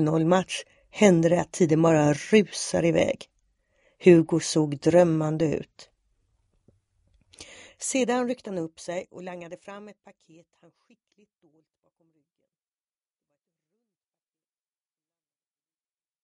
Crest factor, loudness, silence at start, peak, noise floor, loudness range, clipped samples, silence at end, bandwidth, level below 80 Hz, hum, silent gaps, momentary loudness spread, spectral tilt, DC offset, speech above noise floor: 22 dB; -23 LUFS; 0 s; -4 dBFS; under -90 dBFS; 16 LU; under 0.1%; 6.35 s; 11.5 kHz; -62 dBFS; none; none; 21 LU; -5.5 dB/octave; under 0.1%; over 67 dB